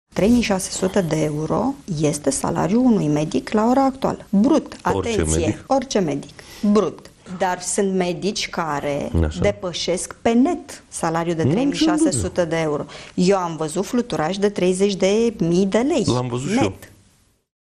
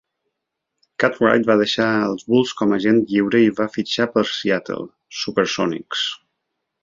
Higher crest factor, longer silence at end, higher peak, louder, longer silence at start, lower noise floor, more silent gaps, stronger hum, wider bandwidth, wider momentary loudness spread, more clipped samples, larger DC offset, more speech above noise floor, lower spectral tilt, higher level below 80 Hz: about the same, 14 dB vs 18 dB; about the same, 0.75 s vs 0.65 s; second, -6 dBFS vs -2 dBFS; about the same, -20 LUFS vs -19 LUFS; second, 0.15 s vs 1 s; second, -58 dBFS vs -79 dBFS; neither; neither; first, 14 kHz vs 7.6 kHz; second, 7 LU vs 10 LU; neither; neither; second, 38 dB vs 61 dB; about the same, -5.5 dB/octave vs -5 dB/octave; first, -42 dBFS vs -60 dBFS